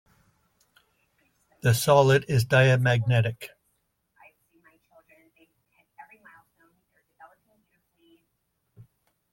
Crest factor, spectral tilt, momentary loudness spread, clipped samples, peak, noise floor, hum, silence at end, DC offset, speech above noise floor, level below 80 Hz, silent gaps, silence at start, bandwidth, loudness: 22 dB; -5.5 dB/octave; 11 LU; under 0.1%; -6 dBFS; -76 dBFS; none; 5.85 s; under 0.1%; 55 dB; -60 dBFS; none; 1.65 s; 16.5 kHz; -22 LUFS